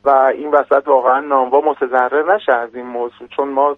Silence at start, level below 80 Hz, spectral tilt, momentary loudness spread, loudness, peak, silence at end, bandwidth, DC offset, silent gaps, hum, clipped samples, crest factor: 0.05 s; -62 dBFS; -6 dB/octave; 11 LU; -15 LUFS; 0 dBFS; 0 s; 4 kHz; under 0.1%; none; none; under 0.1%; 14 dB